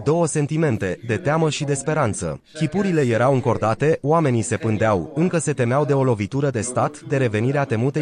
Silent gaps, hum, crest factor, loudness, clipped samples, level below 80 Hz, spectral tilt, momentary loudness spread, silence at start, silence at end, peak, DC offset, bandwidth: none; none; 14 dB; -21 LUFS; under 0.1%; -54 dBFS; -6 dB/octave; 5 LU; 0 s; 0 s; -6 dBFS; under 0.1%; 10.5 kHz